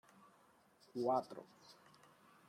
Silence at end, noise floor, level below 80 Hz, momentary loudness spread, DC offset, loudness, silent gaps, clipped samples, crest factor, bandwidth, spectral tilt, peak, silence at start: 0.75 s; -71 dBFS; under -90 dBFS; 24 LU; under 0.1%; -41 LUFS; none; under 0.1%; 20 dB; 15.5 kHz; -6.5 dB/octave; -26 dBFS; 0.95 s